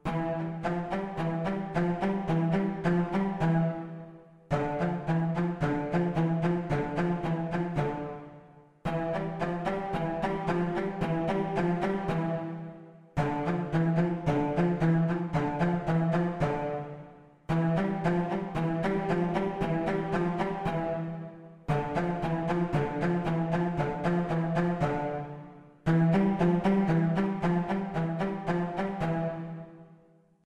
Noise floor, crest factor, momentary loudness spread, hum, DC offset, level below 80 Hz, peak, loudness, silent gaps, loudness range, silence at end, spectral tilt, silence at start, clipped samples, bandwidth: -61 dBFS; 16 dB; 10 LU; none; under 0.1%; -50 dBFS; -14 dBFS; -30 LUFS; none; 4 LU; 0.5 s; -8.5 dB/octave; 0.05 s; under 0.1%; 8.4 kHz